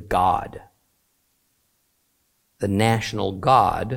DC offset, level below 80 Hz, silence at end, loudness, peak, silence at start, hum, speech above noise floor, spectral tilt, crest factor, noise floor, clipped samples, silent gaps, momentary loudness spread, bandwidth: under 0.1%; -46 dBFS; 0 s; -21 LUFS; -4 dBFS; 0 s; none; 48 dB; -6 dB/octave; 20 dB; -68 dBFS; under 0.1%; none; 14 LU; 16.5 kHz